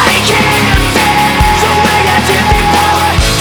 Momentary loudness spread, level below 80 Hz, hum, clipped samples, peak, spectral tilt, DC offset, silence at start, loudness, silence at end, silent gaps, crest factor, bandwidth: 1 LU; -18 dBFS; none; under 0.1%; 0 dBFS; -3.5 dB/octave; under 0.1%; 0 s; -8 LUFS; 0 s; none; 8 dB; over 20 kHz